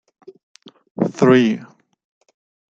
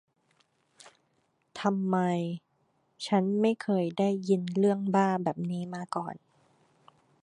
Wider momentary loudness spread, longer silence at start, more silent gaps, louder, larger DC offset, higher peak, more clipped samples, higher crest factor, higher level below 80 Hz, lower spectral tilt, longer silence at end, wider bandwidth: first, 16 LU vs 12 LU; second, 1 s vs 1.55 s; neither; first, -17 LUFS vs -29 LUFS; neither; first, -2 dBFS vs -12 dBFS; neither; about the same, 18 dB vs 20 dB; first, -64 dBFS vs -78 dBFS; about the same, -7 dB/octave vs -7 dB/octave; about the same, 1.05 s vs 1.05 s; second, 7.8 kHz vs 10.5 kHz